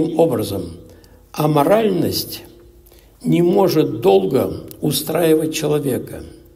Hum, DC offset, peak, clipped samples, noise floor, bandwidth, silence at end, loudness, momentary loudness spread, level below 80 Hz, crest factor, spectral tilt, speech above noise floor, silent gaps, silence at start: none; under 0.1%; -2 dBFS; under 0.1%; -47 dBFS; 16 kHz; 0.2 s; -17 LUFS; 14 LU; -48 dBFS; 16 dB; -6 dB/octave; 30 dB; none; 0 s